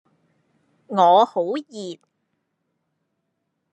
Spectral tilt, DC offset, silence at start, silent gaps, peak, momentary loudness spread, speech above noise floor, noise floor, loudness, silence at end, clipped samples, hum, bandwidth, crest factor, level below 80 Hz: -5.5 dB/octave; under 0.1%; 0.9 s; none; -4 dBFS; 20 LU; 57 dB; -76 dBFS; -19 LUFS; 1.8 s; under 0.1%; none; 8.6 kHz; 20 dB; -86 dBFS